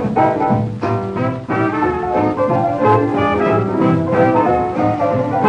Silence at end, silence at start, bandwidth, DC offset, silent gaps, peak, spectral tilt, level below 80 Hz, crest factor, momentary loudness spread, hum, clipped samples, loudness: 0 s; 0 s; 9.6 kHz; under 0.1%; none; -2 dBFS; -9 dB/octave; -42 dBFS; 14 dB; 5 LU; none; under 0.1%; -16 LUFS